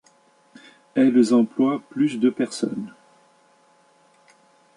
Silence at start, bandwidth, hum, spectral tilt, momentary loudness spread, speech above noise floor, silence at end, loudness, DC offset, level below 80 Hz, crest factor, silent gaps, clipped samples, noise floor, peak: 0.95 s; 11.5 kHz; none; -6 dB/octave; 11 LU; 38 dB; 1.85 s; -21 LUFS; under 0.1%; -72 dBFS; 18 dB; none; under 0.1%; -58 dBFS; -6 dBFS